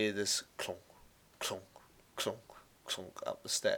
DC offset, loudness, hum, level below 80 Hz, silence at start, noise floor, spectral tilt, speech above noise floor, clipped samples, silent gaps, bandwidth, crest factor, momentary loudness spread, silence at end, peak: under 0.1%; -38 LUFS; none; -74 dBFS; 0 s; -62 dBFS; -1.5 dB/octave; 25 dB; under 0.1%; none; over 20 kHz; 20 dB; 16 LU; 0 s; -18 dBFS